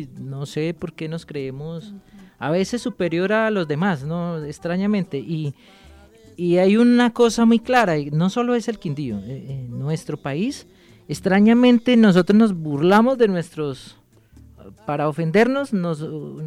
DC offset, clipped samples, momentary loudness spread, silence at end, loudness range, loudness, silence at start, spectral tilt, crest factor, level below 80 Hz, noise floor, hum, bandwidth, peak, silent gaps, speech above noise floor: under 0.1%; under 0.1%; 16 LU; 0 s; 8 LU; -20 LUFS; 0 s; -6.5 dB/octave; 20 dB; -54 dBFS; -49 dBFS; none; 12.5 kHz; 0 dBFS; none; 29 dB